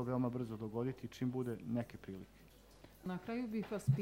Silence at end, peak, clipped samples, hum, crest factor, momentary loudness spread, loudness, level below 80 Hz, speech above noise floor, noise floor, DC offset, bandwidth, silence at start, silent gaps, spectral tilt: 0 s; -22 dBFS; under 0.1%; none; 20 dB; 14 LU; -42 LUFS; -66 dBFS; 21 dB; -61 dBFS; under 0.1%; 16 kHz; 0 s; none; -8 dB/octave